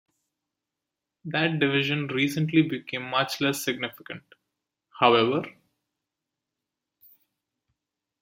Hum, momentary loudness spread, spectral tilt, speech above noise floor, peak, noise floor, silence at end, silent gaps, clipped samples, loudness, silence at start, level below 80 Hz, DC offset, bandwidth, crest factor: none; 20 LU; -5 dB/octave; 62 dB; -4 dBFS; -87 dBFS; 2.7 s; none; under 0.1%; -25 LUFS; 1.25 s; -72 dBFS; under 0.1%; 16.5 kHz; 24 dB